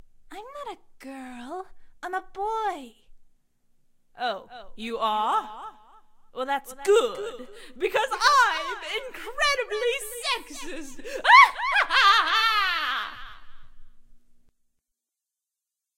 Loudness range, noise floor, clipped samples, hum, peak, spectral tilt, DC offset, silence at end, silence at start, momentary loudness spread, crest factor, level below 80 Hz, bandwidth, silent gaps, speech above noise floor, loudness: 15 LU; -87 dBFS; under 0.1%; none; -2 dBFS; -0.5 dB/octave; under 0.1%; 1.8 s; 0 s; 23 LU; 24 dB; -52 dBFS; 16 kHz; none; 62 dB; -22 LUFS